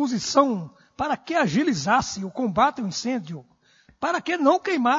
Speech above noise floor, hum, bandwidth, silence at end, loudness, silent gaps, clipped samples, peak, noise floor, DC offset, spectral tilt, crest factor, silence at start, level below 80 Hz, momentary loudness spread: 36 dB; none; 7.8 kHz; 0 s; -23 LUFS; none; under 0.1%; -6 dBFS; -58 dBFS; under 0.1%; -4.5 dB/octave; 18 dB; 0 s; -58 dBFS; 10 LU